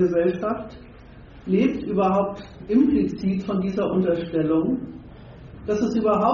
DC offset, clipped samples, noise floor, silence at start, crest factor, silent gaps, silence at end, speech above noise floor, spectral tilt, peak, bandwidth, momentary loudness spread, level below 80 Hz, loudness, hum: under 0.1%; under 0.1%; -44 dBFS; 0 s; 16 dB; none; 0 s; 22 dB; -7.5 dB/octave; -8 dBFS; 7.2 kHz; 18 LU; -48 dBFS; -23 LUFS; none